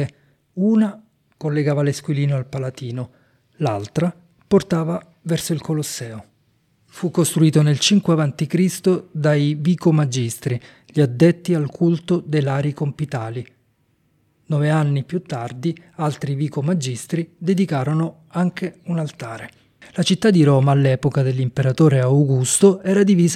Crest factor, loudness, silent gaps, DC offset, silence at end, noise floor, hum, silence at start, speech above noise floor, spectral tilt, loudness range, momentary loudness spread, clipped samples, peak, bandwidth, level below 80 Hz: 18 dB; -19 LUFS; none; under 0.1%; 0 s; -63 dBFS; none; 0 s; 45 dB; -6 dB/octave; 6 LU; 13 LU; under 0.1%; -2 dBFS; 14.5 kHz; -58 dBFS